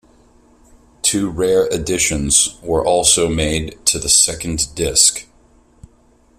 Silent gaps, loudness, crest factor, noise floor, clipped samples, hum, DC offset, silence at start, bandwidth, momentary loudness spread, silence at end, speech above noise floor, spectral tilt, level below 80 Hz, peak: none; -15 LUFS; 18 dB; -53 dBFS; under 0.1%; 60 Hz at -40 dBFS; under 0.1%; 1.05 s; 16 kHz; 7 LU; 1.15 s; 36 dB; -2 dB/octave; -36 dBFS; 0 dBFS